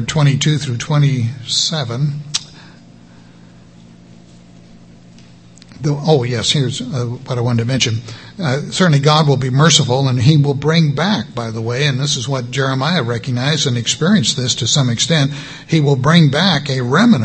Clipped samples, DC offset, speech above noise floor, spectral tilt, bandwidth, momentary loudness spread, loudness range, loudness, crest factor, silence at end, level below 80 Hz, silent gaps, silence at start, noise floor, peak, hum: under 0.1%; 0.2%; 27 dB; -4.5 dB/octave; 8.8 kHz; 9 LU; 9 LU; -15 LUFS; 16 dB; 0 s; -48 dBFS; none; 0 s; -42 dBFS; 0 dBFS; none